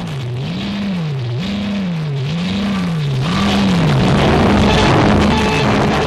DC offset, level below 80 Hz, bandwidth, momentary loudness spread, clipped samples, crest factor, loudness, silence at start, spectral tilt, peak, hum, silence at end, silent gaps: under 0.1%; -30 dBFS; 12.5 kHz; 9 LU; under 0.1%; 14 dB; -15 LUFS; 0 s; -6 dB/octave; 0 dBFS; none; 0 s; none